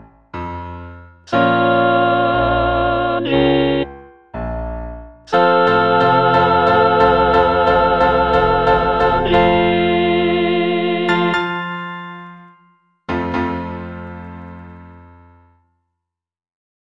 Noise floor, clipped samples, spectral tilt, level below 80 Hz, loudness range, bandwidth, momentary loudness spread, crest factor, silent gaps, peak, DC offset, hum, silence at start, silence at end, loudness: -85 dBFS; under 0.1%; -7.5 dB/octave; -34 dBFS; 14 LU; 7.6 kHz; 19 LU; 16 dB; none; 0 dBFS; under 0.1%; none; 0.35 s; 1.9 s; -15 LUFS